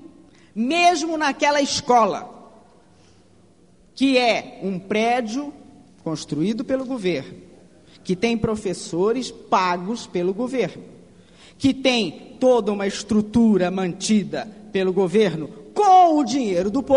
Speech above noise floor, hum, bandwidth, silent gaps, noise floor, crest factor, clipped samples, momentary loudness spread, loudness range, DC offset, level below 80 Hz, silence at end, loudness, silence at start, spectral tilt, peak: 34 dB; none; 10.5 kHz; none; -55 dBFS; 16 dB; under 0.1%; 12 LU; 6 LU; 0.1%; -54 dBFS; 0 s; -21 LUFS; 0.05 s; -4.5 dB/octave; -4 dBFS